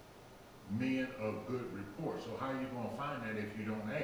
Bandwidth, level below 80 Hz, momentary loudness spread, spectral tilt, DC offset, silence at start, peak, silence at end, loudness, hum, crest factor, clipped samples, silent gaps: over 20 kHz; -68 dBFS; 13 LU; -7 dB/octave; under 0.1%; 0 s; -26 dBFS; 0 s; -40 LUFS; none; 16 dB; under 0.1%; none